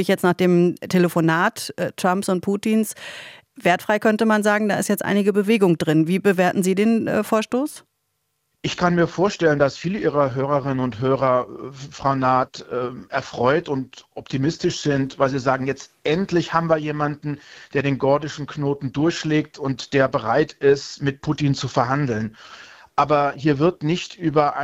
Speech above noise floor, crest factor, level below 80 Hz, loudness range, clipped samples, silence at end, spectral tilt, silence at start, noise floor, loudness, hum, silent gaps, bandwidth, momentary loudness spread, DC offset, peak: 52 dB; 18 dB; -56 dBFS; 4 LU; under 0.1%; 0 s; -6 dB/octave; 0 s; -73 dBFS; -21 LUFS; none; none; 16.5 kHz; 10 LU; under 0.1%; -2 dBFS